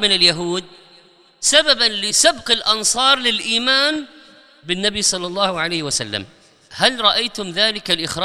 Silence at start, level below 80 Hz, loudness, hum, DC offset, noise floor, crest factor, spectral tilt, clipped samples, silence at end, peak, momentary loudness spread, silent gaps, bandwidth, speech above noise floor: 0 s; -52 dBFS; -16 LUFS; none; under 0.1%; -50 dBFS; 18 dB; -1 dB/octave; under 0.1%; 0 s; 0 dBFS; 10 LU; none; 16.5 kHz; 32 dB